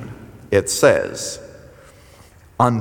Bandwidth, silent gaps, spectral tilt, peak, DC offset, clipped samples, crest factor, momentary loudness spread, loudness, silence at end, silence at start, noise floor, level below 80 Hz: over 20 kHz; none; -4.5 dB/octave; -2 dBFS; under 0.1%; under 0.1%; 20 dB; 21 LU; -18 LUFS; 0 s; 0 s; -47 dBFS; -50 dBFS